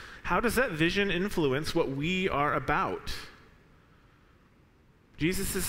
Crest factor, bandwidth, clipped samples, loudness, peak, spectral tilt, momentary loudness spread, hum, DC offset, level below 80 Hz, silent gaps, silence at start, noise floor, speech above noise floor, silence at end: 18 dB; 16 kHz; under 0.1%; -29 LUFS; -12 dBFS; -4.5 dB/octave; 8 LU; none; under 0.1%; -46 dBFS; none; 0 s; -61 dBFS; 33 dB; 0 s